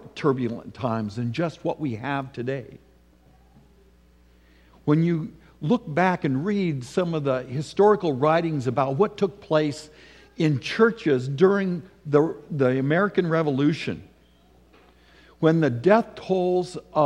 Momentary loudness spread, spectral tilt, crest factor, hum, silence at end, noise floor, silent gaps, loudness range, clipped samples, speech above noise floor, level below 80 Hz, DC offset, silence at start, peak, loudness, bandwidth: 10 LU; -7.5 dB/octave; 20 dB; none; 0 s; -56 dBFS; none; 8 LU; under 0.1%; 34 dB; -58 dBFS; under 0.1%; 0.05 s; -4 dBFS; -24 LUFS; 10.5 kHz